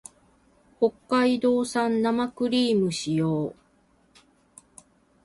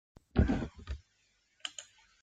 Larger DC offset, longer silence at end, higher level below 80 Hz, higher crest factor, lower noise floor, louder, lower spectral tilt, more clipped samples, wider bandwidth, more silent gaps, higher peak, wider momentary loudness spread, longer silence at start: neither; first, 1.7 s vs 0.4 s; second, -64 dBFS vs -42 dBFS; second, 16 dB vs 24 dB; second, -63 dBFS vs -74 dBFS; first, -25 LUFS vs -35 LUFS; about the same, -5.5 dB/octave vs -6 dB/octave; neither; first, 11.5 kHz vs 9.2 kHz; neither; first, -10 dBFS vs -14 dBFS; second, 5 LU vs 17 LU; first, 0.8 s vs 0.35 s